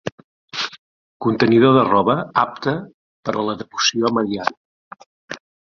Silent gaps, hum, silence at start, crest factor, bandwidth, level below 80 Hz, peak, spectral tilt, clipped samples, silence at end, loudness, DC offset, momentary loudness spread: 0.12-0.18 s, 0.24-0.48 s, 0.79-1.20 s, 2.94-3.23 s, 4.57-4.91 s, 5.06-5.28 s; none; 0.05 s; 18 dB; 7.2 kHz; -58 dBFS; -2 dBFS; -5 dB/octave; under 0.1%; 0.4 s; -19 LUFS; under 0.1%; 18 LU